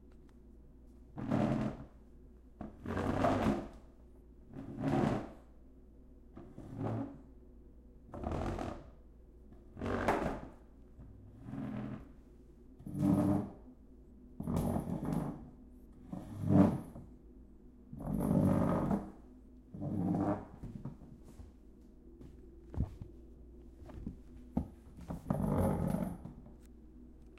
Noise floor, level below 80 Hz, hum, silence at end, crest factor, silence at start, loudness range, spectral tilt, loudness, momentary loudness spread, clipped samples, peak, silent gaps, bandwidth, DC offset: -57 dBFS; -52 dBFS; none; 0 s; 24 dB; 0.05 s; 10 LU; -8.5 dB/octave; -36 LUFS; 25 LU; under 0.1%; -14 dBFS; none; 15 kHz; under 0.1%